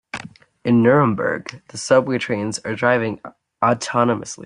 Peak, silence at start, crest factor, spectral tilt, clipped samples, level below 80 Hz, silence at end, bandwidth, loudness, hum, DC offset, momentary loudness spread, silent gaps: -2 dBFS; 0.15 s; 18 dB; -5.5 dB/octave; under 0.1%; -58 dBFS; 0 s; 11 kHz; -19 LUFS; none; under 0.1%; 16 LU; none